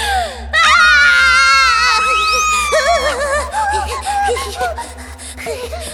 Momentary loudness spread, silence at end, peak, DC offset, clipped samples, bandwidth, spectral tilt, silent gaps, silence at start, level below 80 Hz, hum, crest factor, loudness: 17 LU; 0 s; 0 dBFS; under 0.1%; under 0.1%; 17 kHz; -1 dB/octave; none; 0 s; -32 dBFS; none; 14 dB; -12 LUFS